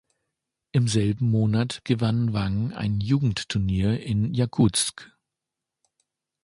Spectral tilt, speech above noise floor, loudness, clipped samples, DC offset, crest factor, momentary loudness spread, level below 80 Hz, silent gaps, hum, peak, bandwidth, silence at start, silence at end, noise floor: -5.5 dB/octave; 63 dB; -24 LUFS; under 0.1%; under 0.1%; 16 dB; 6 LU; -46 dBFS; none; none; -8 dBFS; 11.5 kHz; 0.75 s; 1.35 s; -86 dBFS